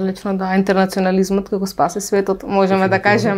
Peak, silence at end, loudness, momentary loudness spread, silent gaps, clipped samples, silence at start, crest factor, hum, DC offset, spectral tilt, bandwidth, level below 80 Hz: 0 dBFS; 0 s; -17 LUFS; 5 LU; none; under 0.1%; 0 s; 16 dB; none; under 0.1%; -6 dB/octave; 15.5 kHz; -48 dBFS